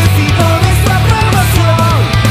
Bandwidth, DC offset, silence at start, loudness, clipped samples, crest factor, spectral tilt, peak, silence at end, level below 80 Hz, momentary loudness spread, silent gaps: 16 kHz; under 0.1%; 0 s; -10 LUFS; 0.4%; 8 dB; -5.5 dB/octave; 0 dBFS; 0 s; -20 dBFS; 1 LU; none